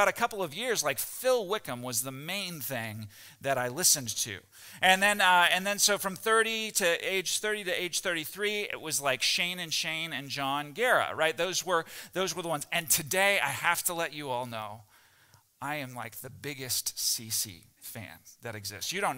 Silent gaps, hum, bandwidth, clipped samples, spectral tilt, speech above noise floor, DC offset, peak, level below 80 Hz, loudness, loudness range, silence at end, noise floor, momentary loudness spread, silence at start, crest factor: none; none; 16 kHz; under 0.1%; -1.5 dB/octave; 32 dB; under 0.1%; -8 dBFS; -70 dBFS; -28 LUFS; 9 LU; 0 s; -63 dBFS; 16 LU; 0 s; 22 dB